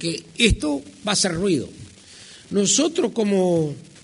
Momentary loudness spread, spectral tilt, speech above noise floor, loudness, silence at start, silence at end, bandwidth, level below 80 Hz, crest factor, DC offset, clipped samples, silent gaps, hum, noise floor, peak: 10 LU; -3.5 dB/octave; 24 dB; -21 LUFS; 0 s; 0.2 s; 11 kHz; -36 dBFS; 20 dB; under 0.1%; under 0.1%; none; none; -45 dBFS; -2 dBFS